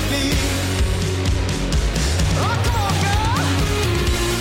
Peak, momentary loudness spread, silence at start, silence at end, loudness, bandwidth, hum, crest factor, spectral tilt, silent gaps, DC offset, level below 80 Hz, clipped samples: -10 dBFS; 2 LU; 0 s; 0 s; -20 LUFS; 16.5 kHz; none; 10 dB; -4.5 dB/octave; none; under 0.1%; -24 dBFS; under 0.1%